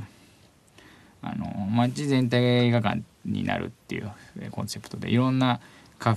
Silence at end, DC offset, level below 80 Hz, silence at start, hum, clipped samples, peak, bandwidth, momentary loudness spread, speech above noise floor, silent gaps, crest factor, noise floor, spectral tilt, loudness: 0 s; under 0.1%; -64 dBFS; 0 s; none; under 0.1%; -8 dBFS; 13 kHz; 15 LU; 32 dB; none; 18 dB; -57 dBFS; -6.5 dB/octave; -26 LUFS